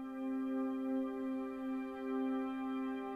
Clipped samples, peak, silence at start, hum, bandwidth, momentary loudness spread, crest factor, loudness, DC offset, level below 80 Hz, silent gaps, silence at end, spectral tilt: under 0.1%; -28 dBFS; 0 s; 60 Hz at -75 dBFS; 4.7 kHz; 3 LU; 10 dB; -39 LUFS; under 0.1%; -74 dBFS; none; 0 s; -6.5 dB/octave